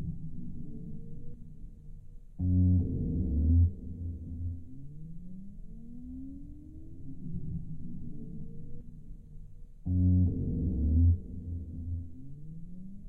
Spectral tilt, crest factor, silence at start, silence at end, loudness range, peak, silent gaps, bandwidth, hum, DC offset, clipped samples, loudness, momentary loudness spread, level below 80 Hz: -13.5 dB/octave; 16 dB; 0 s; 0 s; 13 LU; -16 dBFS; none; 0.8 kHz; none; under 0.1%; under 0.1%; -32 LUFS; 24 LU; -38 dBFS